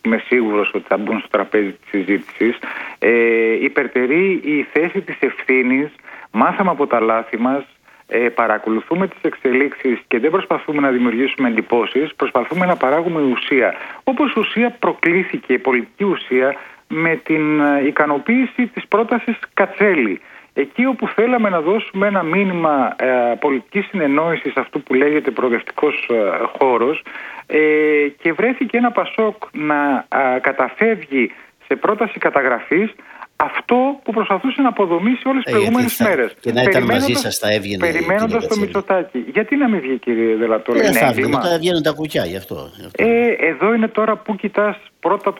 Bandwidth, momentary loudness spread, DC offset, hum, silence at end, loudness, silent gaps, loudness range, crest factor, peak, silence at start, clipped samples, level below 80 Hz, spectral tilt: 18.5 kHz; 6 LU; under 0.1%; none; 0 s; -17 LUFS; none; 2 LU; 16 dB; 0 dBFS; 0.05 s; under 0.1%; -58 dBFS; -5.5 dB/octave